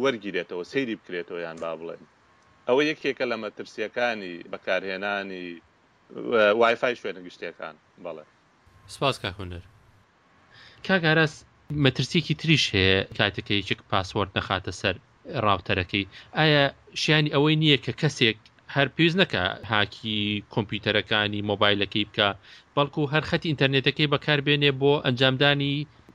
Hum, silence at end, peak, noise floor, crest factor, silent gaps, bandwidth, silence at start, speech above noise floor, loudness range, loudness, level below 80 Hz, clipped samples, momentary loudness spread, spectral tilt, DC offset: none; 0.05 s; -4 dBFS; -60 dBFS; 22 dB; none; 11.5 kHz; 0 s; 35 dB; 7 LU; -24 LUFS; -58 dBFS; under 0.1%; 16 LU; -5.5 dB/octave; under 0.1%